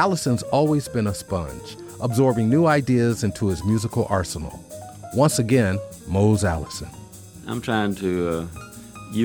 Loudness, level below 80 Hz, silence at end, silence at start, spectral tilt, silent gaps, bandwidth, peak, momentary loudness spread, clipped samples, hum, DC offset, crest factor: -22 LUFS; -44 dBFS; 0 s; 0 s; -6 dB/octave; none; over 20 kHz; -6 dBFS; 19 LU; under 0.1%; none; under 0.1%; 18 dB